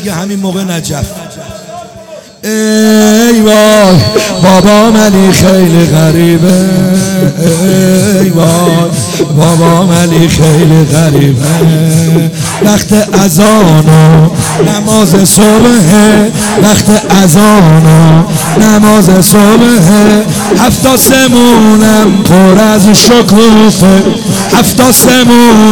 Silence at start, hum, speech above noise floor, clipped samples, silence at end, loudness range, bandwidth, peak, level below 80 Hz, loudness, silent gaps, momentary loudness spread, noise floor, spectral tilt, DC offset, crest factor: 0 s; none; 24 dB; 9%; 0 s; 3 LU; over 20 kHz; 0 dBFS; -30 dBFS; -5 LUFS; none; 7 LU; -28 dBFS; -5 dB/octave; 2%; 4 dB